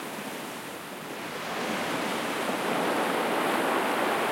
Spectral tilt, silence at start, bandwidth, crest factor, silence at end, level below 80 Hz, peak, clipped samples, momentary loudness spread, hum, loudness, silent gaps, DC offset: -3.5 dB/octave; 0 s; 16.5 kHz; 16 dB; 0 s; -74 dBFS; -14 dBFS; under 0.1%; 11 LU; none; -29 LUFS; none; under 0.1%